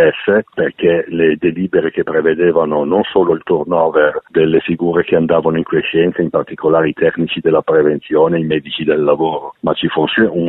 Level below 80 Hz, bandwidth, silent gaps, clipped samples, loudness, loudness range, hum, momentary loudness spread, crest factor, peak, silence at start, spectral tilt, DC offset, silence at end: -50 dBFS; 4.1 kHz; none; under 0.1%; -14 LUFS; 1 LU; none; 4 LU; 12 dB; 0 dBFS; 0 s; -10 dB/octave; under 0.1%; 0 s